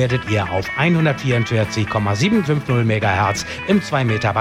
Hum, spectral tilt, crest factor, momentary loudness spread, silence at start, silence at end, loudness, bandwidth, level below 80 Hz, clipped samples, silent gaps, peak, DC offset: none; -6 dB/octave; 14 dB; 3 LU; 0 s; 0 s; -18 LUFS; 14 kHz; -46 dBFS; under 0.1%; none; -4 dBFS; under 0.1%